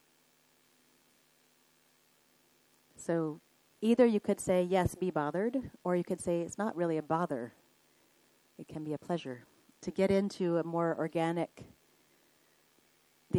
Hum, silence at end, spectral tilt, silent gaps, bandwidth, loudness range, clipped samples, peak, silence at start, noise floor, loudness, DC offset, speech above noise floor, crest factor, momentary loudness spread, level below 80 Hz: none; 0 s; -6.5 dB/octave; none; 18.5 kHz; 8 LU; under 0.1%; -12 dBFS; 3 s; -69 dBFS; -33 LUFS; under 0.1%; 37 dB; 22 dB; 15 LU; -64 dBFS